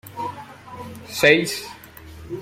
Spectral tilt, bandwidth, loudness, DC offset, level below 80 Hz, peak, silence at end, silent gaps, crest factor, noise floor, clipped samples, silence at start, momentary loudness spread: -3.5 dB/octave; 16.5 kHz; -20 LUFS; under 0.1%; -54 dBFS; -2 dBFS; 0 s; none; 22 dB; -41 dBFS; under 0.1%; 0.05 s; 26 LU